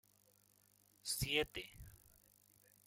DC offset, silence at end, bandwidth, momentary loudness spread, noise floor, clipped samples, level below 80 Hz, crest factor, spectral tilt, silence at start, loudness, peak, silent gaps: under 0.1%; 0.9 s; 16.5 kHz; 22 LU; -73 dBFS; under 0.1%; -62 dBFS; 26 dB; -2.5 dB/octave; 1.05 s; -40 LUFS; -20 dBFS; none